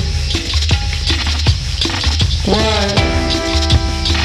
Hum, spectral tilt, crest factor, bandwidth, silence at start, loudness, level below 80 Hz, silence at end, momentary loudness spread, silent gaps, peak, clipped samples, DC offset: none; -4.5 dB/octave; 14 dB; 12.5 kHz; 0 s; -15 LUFS; -18 dBFS; 0 s; 3 LU; none; 0 dBFS; under 0.1%; under 0.1%